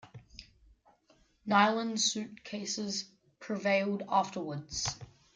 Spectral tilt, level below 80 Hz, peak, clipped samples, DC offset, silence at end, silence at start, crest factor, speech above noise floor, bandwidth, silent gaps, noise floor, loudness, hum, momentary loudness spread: -3 dB/octave; -64 dBFS; -12 dBFS; under 0.1%; under 0.1%; 0.3 s; 0.05 s; 22 dB; 36 dB; 9.6 kHz; none; -68 dBFS; -32 LUFS; none; 24 LU